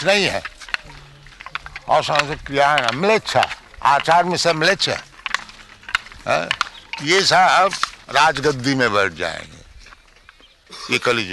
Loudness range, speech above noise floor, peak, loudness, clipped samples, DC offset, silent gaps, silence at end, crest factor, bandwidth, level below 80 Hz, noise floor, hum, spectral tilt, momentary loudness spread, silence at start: 3 LU; 32 dB; -4 dBFS; -18 LUFS; under 0.1%; under 0.1%; none; 0 s; 16 dB; 12 kHz; -48 dBFS; -49 dBFS; none; -3 dB/octave; 13 LU; 0 s